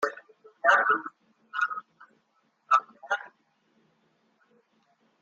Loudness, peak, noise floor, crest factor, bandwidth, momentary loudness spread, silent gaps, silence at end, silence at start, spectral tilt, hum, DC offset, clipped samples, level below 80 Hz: -27 LUFS; -8 dBFS; -71 dBFS; 24 dB; 8.4 kHz; 20 LU; none; 1.95 s; 0 s; -1.5 dB/octave; none; under 0.1%; under 0.1%; -88 dBFS